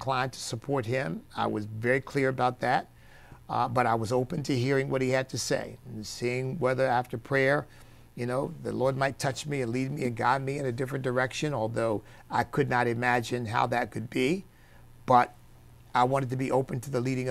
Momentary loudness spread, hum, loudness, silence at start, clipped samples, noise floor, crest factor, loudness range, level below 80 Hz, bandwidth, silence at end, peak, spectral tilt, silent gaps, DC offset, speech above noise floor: 7 LU; none; -29 LUFS; 0 s; under 0.1%; -52 dBFS; 22 dB; 2 LU; -56 dBFS; 15 kHz; 0 s; -8 dBFS; -5.5 dB/octave; none; under 0.1%; 24 dB